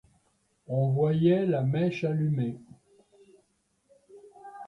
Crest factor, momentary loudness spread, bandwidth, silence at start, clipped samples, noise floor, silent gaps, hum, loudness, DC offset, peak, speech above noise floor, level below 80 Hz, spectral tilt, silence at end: 18 dB; 19 LU; 6.2 kHz; 0.7 s; under 0.1%; -72 dBFS; none; none; -27 LUFS; under 0.1%; -12 dBFS; 46 dB; -66 dBFS; -9.5 dB/octave; 0 s